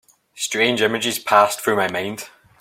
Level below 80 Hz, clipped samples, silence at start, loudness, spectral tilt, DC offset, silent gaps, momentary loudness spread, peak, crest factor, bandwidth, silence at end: -64 dBFS; under 0.1%; 0.35 s; -19 LUFS; -2.5 dB/octave; under 0.1%; none; 13 LU; -2 dBFS; 20 dB; 16.5 kHz; 0.35 s